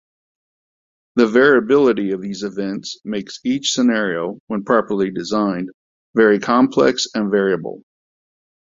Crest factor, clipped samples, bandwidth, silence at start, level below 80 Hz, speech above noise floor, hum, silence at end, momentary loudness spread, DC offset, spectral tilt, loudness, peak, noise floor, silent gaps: 18 dB; under 0.1%; 7.8 kHz; 1.15 s; -60 dBFS; over 73 dB; none; 0.9 s; 13 LU; under 0.1%; -4.5 dB/octave; -18 LUFS; 0 dBFS; under -90 dBFS; 4.40-4.47 s, 5.74-6.14 s